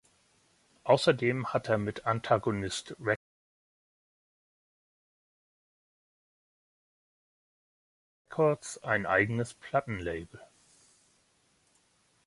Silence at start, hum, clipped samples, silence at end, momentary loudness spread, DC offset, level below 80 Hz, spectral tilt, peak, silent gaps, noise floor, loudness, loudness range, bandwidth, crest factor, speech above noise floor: 0.85 s; none; under 0.1%; 1.85 s; 10 LU; under 0.1%; -62 dBFS; -5.5 dB/octave; -10 dBFS; 3.16-8.25 s; -70 dBFS; -30 LUFS; 9 LU; 11.5 kHz; 24 dB; 40 dB